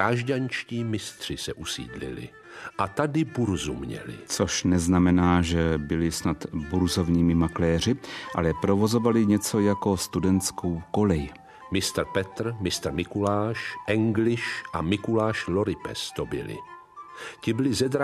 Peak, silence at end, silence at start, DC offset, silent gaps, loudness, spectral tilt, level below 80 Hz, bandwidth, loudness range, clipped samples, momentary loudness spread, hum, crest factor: -8 dBFS; 0 s; 0 s; under 0.1%; none; -26 LUFS; -5.5 dB/octave; -48 dBFS; 14 kHz; 6 LU; under 0.1%; 13 LU; none; 18 dB